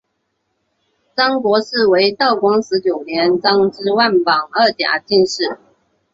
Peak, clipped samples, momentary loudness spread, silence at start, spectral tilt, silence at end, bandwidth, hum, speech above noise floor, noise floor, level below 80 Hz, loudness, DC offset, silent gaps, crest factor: -2 dBFS; under 0.1%; 5 LU; 1.15 s; -4 dB/octave; 0.6 s; 7.6 kHz; none; 55 dB; -70 dBFS; -60 dBFS; -15 LUFS; under 0.1%; none; 16 dB